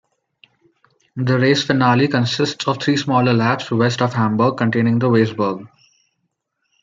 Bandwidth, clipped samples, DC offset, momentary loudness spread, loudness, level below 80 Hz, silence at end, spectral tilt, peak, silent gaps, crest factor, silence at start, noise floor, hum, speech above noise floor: 7.6 kHz; under 0.1%; under 0.1%; 6 LU; -17 LUFS; -60 dBFS; 1.15 s; -6 dB/octave; -2 dBFS; none; 18 dB; 1.15 s; -72 dBFS; none; 56 dB